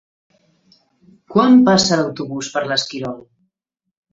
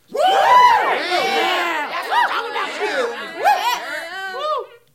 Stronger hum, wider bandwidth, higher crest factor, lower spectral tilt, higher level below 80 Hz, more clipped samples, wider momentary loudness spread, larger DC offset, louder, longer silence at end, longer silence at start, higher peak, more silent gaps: neither; second, 7.8 kHz vs 16.5 kHz; about the same, 18 dB vs 16 dB; first, -4.5 dB/octave vs -1 dB/octave; first, -56 dBFS vs -66 dBFS; neither; first, 17 LU vs 13 LU; neither; about the same, -16 LUFS vs -18 LUFS; first, 0.95 s vs 0.3 s; first, 1.3 s vs 0.1 s; about the same, 0 dBFS vs -2 dBFS; neither